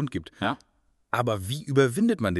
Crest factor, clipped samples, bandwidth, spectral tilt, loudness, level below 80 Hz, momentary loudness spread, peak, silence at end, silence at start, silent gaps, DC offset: 18 dB; under 0.1%; 12.5 kHz; -6 dB/octave; -26 LUFS; -56 dBFS; 9 LU; -8 dBFS; 0 s; 0 s; none; under 0.1%